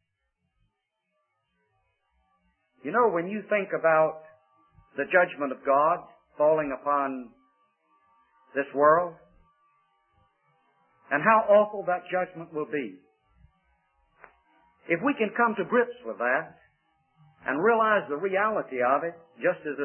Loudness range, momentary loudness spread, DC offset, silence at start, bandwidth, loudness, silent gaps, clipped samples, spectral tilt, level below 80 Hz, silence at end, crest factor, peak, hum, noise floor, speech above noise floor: 5 LU; 13 LU; under 0.1%; 2.85 s; 3.3 kHz; -26 LUFS; none; under 0.1%; -9.5 dB/octave; -72 dBFS; 0 s; 22 dB; -8 dBFS; none; -79 dBFS; 54 dB